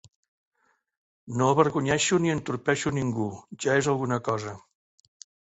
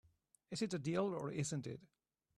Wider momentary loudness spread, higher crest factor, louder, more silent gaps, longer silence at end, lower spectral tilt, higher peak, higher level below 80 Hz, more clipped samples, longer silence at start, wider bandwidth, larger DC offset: about the same, 10 LU vs 11 LU; about the same, 22 dB vs 18 dB; first, -26 LUFS vs -42 LUFS; neither; first, 0.85 s vs 0.55 s; about the same, -5 dB/octave vs -5.5 dB/octave; first, -6 dBFS vs -24 dBFS; first, -60 dBFS vs -76 dBFS; neither; first, 1.25 s vs 0.5 s; second, 8.2 kHz vs 13 kHz; neither